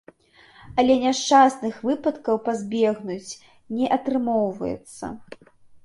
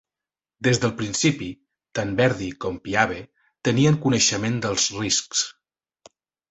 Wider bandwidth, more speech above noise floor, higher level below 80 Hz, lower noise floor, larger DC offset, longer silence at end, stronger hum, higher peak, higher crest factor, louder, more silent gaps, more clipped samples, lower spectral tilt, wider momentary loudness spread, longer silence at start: first, 11.5 kHz vs 8.4 kHz; second, 31 dB vs over 68 dB; second, -58 dBFS vs -52 dBFS; second, -53 dBFS vs under -90 dBFS; neither; second, 0.1 s vs 1 s; neither; about the same, -4 dBFS vs -2 dBFS; about the same, 18 dB vs 22 dB; about the same, -22 LUFS vs -22 LUFS; neither; neither; about the same, -4.5 dB/octave vs -4 dB/octave; first, 19 LU vs 11 LU; about the same, 0.65 s vs 0.6 s